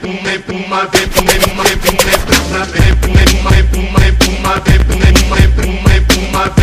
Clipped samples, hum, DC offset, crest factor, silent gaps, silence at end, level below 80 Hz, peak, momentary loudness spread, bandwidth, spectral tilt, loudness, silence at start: 2%; none; under 0.1%; 10 dB; none; 0 s; -14 dBFS; 0 dBFS; 6 LU; 16 kHz; -4.5 dB/octave; -11 LUFS; 0 s